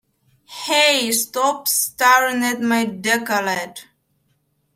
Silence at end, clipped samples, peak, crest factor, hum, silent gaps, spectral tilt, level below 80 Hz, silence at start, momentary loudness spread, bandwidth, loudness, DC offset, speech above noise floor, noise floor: 0.9 s; under 0.1%; -2 dBFS; 18 dB; none; none; -1.5 dB/octave; -68 dBFS; 0.5 s; 11 LU; 16.5 kHz; -17 LUFS; under 0.1%; 48 dB; -66 dBFS